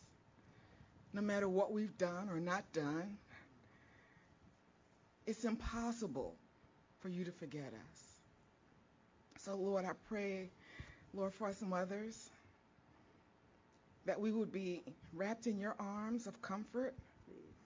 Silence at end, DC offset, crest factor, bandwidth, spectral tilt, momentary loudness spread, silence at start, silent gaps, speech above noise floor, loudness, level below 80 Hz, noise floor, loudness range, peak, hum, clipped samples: 0 s; under 0.1%; 20 dB; 7.6 kHz; -6 dB/octave; 17 LU; 0 s; none; 28 dB; -43 LUFS; -66 dBFS; -71 dBFS; 6 LU; -26 dBFS; none; under 0.1%